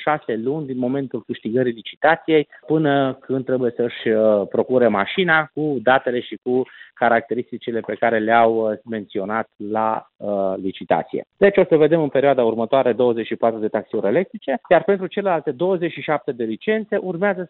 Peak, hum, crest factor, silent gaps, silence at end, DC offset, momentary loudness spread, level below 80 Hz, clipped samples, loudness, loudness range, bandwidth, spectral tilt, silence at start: -2 dBFS; none; 16 dB; 1.97-2.01 s; 0.05 s; under 0.1%; 10 LU; -64 dBFS; under 0.1%; -20 LUFS; 3 LU; 4.3 kHz; -11 dB/octave; 0 s